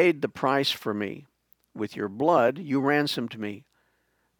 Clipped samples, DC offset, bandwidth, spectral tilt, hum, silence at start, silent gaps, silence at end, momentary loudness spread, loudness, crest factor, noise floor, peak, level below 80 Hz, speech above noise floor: under 0.1%; under 0.1%; 19.5 kHz; -5.5 dB/octave; none; 0 s; none; 0.8 s; 14 LU; -26 LUFS; 20 dB; -71 dBFS; -8 dBFS; -72 dBFS; 46 dB